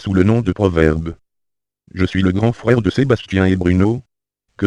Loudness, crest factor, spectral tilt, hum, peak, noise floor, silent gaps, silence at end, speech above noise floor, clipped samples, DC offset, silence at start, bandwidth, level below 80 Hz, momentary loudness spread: -16 LUFS; 16 dB; -8 dB/octave; none; 0 dBFS; -80 dBFS; none; 0 s; 64 dB; under 0.1%; under 0.1%; 0 s; 9.8 kHz; -36 dBFS; 8 LU